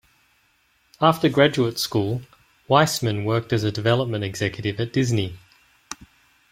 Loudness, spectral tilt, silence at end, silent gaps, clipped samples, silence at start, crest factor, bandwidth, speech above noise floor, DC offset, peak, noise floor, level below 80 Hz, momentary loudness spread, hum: -22 LUFS; -5.5 dB/octave; 0.55 s; none; under 0.1%; 1 s; 22 dB; 16.5 kHz; 42 dB; under 0.1%; -2 dBFS; -63 dBFS; -56 dBFS; 14 LU; none